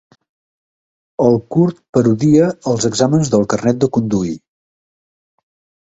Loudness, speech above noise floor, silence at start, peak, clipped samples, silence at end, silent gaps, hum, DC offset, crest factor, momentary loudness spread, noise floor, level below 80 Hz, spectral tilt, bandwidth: -15 LUFS; over 76 dB; 1.2 s; 0 dBFS; under 0.1%; 1.5 s; 1.89-1.93 s; none; under 0.1%; 16 dB; 7 LU; under -90 dBFS; -50 dBFS; -6.5 dB/octave; 8.2 kHz